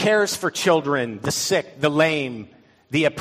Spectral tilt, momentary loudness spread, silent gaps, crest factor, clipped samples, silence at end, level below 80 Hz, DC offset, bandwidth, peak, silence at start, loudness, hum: -4 dB/octave; 7 LU; none; 18 dB; under 0.1%; 0 s; -60 dBFS; under 0.1%; 15.5 kHz; -4 dBFS; 0 s; -21 LUFS; none